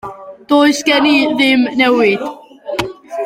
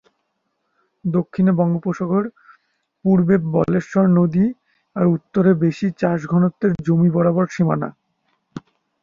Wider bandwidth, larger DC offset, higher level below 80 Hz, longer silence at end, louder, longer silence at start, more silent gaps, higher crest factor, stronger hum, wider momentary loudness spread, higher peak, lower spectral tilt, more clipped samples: first, 15.5 kHz vs 7 kHz; neither; about the same, -52 dBFS vs -54 dBFS; second, 0 s vs 0.45 s; first, -13 LUFS vs -18 LUFS; second, 0.05 s vs 1.05 s; neither; about the same, 12 dB vs 16 dB; neither; about the same, 14 LU vs 13 LU; about the same, 0 dBFS vs -2 dBFS; second, -3.5 dB/octave vs -9.5 dB/octave; neither